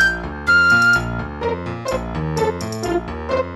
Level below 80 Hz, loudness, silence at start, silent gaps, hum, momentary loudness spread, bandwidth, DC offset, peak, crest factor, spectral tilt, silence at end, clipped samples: -34 dBFS; -18 LUFS; 0 s; none; none; 12 LU; 12.5 kHz; 0.1%; -4 dBFS; 14 dB; -5 dB/octave; 0 s; under 0.1%